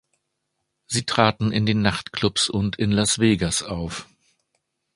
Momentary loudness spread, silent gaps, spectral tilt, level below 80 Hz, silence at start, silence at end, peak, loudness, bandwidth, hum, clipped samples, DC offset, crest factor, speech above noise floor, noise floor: 10 LU; none; -4 dB/octave; -46 dBFS; 0.9 s; 0.9 s; 0 dBFS; -22 LUFS; 11.5 kHz; none; under 0.1%; under 0.1%; 24 dB; 55 dB; -77 dBFS